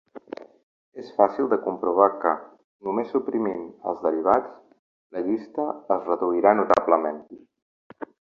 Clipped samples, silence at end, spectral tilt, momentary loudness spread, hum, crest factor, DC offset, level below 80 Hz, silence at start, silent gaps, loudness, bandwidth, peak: under 0.1%; 0.35 s; -7.5 dB/octave; 21 LU; none; 22 dB; under 0.1%; -66 dBFS; 0.15 s; 0.63-0.92 s, 2.64-2.79 s, 4.79-5.10 s, 7.62-7.90 s; -24 LUFS; 7.2 kHz; -2 dBFS